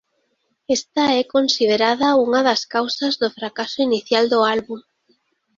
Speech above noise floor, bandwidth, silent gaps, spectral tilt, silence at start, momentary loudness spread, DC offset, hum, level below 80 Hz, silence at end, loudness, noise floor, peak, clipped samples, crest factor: 50 dB; 7.6 kHz; none; -3 dB/octave; 0.7 s; 8 LU; under 0.1%; none; -64 dBFS; 0.75 s; -18 LUFS; -69 dBFS; -2 dBFS; under 0.1%; 18 dB